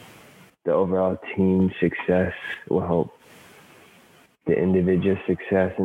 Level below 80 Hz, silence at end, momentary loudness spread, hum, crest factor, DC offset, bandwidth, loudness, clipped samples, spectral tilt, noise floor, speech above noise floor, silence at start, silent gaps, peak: -54 dBFS; 0 s; 7 LU; none; 16 dB; under 0.1%; 4.2 kHz; -23 LUFS; under 0.1%; -9 dB/octave; -55 dBFS; 33 dB; 0 s; none; -8 dBFS